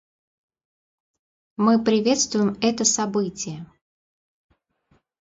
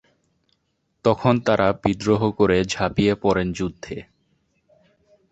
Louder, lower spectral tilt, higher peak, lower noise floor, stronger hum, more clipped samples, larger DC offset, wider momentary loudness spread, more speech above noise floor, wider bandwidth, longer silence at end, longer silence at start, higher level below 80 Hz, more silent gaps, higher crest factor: about the same, -21 LUFS vs -21 LUFS; second, -3.5 dB/octave vs -6 dB/octave; about the same, -6 dBFS vs -4 dBFS; second, -65 dBFS vs -71 dBFS; neither; neither; neither; first, 13 LU vs 10 LU; second, 44 dB vs 51 dB; about the same, 7.8 kHz vs 8.2 kHz; first, 1.55 s vs 1.3 s; first, 1.6 s vs 1.05 s; second, -64 dBFS vs -46 dBFS; neither; about the same, 20 dB vs 20 dB